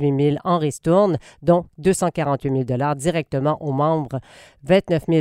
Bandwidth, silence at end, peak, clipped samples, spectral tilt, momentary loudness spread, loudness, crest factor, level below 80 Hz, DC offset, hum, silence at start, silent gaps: 15.5 kHz; 0 s; -4 dBFS; under 0.1%; -6.5 dB/octave; 5 LU; -20 LUFS; 16 dB; -50 dBFS; under 0.1%; none; 0 s; none